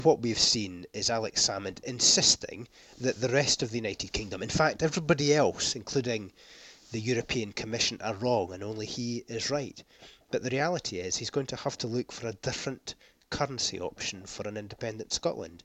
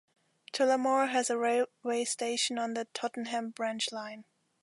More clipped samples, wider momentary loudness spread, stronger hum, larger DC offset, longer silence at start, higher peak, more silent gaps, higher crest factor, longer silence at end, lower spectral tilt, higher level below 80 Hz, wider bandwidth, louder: neither; first, 14 LU vs 9 LU; neither; neither; second, 0 s vs 0.55 s; first, -8 dBFS vs -16 dBFS; neither; first, 22 dB vs 16 dB; second, 0.05 s vs 0.4 s; first, -3 dB/octave vs -1.5 dB/octave; first, -56 dBFS vs -86 dBFS; first, 15 kHz vs 11.5 kHz; about the same, -29 LUFS vs -31 LUFS